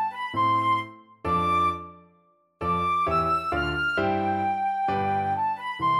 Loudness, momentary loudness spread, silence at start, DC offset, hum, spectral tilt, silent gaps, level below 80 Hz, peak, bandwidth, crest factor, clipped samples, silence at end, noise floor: -25 LUFS; 5 LU; 0 s; under 0.1%; none; -6.5 dB/octave; none; -48 dBFS; -14 dBFS; 13 kHz; 12 dB; under 0.1%; 0 s; -63 dBFS